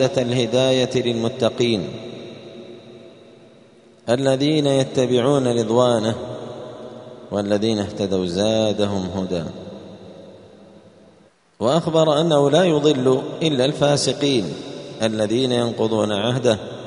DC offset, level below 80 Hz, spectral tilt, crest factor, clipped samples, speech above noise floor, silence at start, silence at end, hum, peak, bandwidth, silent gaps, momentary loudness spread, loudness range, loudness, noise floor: under 0.1%; -56 dBFS; -5.5 dB/octave; 18 dB; under 0.1%; 35 dB; 0 s; 0 s; none; -2 dBFS; 11 kHz; none; 19 LU; 7 LU; -19 LUFS; -54 dBFS